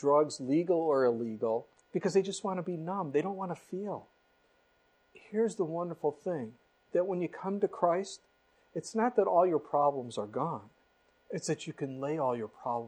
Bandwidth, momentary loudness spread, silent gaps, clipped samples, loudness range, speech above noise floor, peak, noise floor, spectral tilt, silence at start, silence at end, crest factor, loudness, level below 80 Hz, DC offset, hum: 10.5 kHz; 11 LU; none; under 0.1%; 6 LU; 38 dB; -14 dBFS; -70 dBFS; -6 dB/octave; 0 s; 0 s; 18 dB; -32 LUFS; -80 dBFS; under 0.1%; none